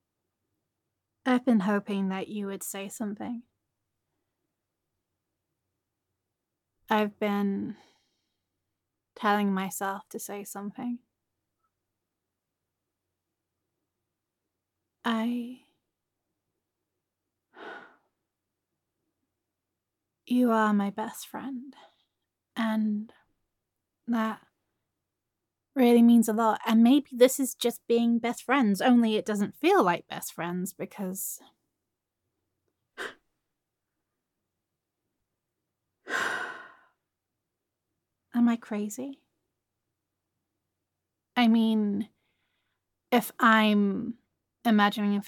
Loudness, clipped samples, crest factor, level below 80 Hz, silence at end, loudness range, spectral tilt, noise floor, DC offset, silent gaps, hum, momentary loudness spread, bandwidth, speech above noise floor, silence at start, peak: -27 LUFS; under 0.1%; 22 dB; -84 dBFS; 0 s; 18 LU; -5 dB/octave; -86 dBFS; under 0.1%; none; none; 18 LU; 17.5 kHz; 60 dB; 1.25 s; -8 dBFS